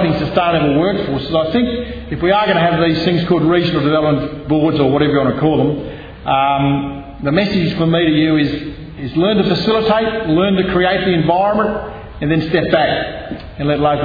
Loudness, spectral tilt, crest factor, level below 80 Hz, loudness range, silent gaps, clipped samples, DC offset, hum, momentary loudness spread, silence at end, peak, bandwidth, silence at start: -15 LUFS; -8.5 dB/octave; 14 dB; -36 dBFS; 2 LU; none; under 0.1%; under 0.1%; none; 10 LU; 0 s; 0 dBFS; 5 kHz; 0 s